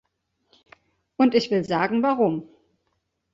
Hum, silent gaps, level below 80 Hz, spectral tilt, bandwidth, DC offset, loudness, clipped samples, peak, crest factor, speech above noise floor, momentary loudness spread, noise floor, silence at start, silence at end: none; none; -66 dBFS; -6.5 dB/octave; 7.8 kHz; under 0.1%; -22 LUFS; under 0.1%; -6 dBFS; 18 dB; 53 dB; 9 LU; -74 dBFS; 1.2 s; 0.9 s